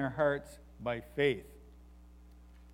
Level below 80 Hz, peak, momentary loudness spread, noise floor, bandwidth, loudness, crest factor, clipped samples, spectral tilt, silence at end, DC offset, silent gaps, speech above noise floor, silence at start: -56 dBFS; -16 dBFS; 17 LU; -55 dBFS; 15.5 kHz; -34 LUFS; 20 dB; under 0.1%; -6.5 dB/octave; 0 s; under 0.1%; none; 21 dB; 0 s